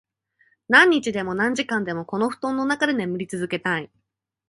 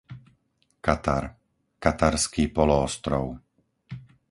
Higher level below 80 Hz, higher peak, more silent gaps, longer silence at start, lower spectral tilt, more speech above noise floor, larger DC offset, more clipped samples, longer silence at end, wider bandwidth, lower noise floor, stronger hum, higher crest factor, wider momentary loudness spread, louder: second, -64 dBFS vs -40 dBFS; about the same, -2 dBFS vs -4 dBFS; neither; first, 0.7 s vs 0.1 s; about the same, -4.5 dB/octave vs -5 dB/octave; about the same, 42 dB vs 45 dB; neither; neither; first, 0.65 s vs 0.25 s; about the same, 11.5 kHz vs 11.5 kHz; second, -64 dBFS vs -69 dBFS; neither; about the same, 22 dB vs 22 dB; second, 13 LU vs 21 LU; first, -21 LUFS vs -25 LUFS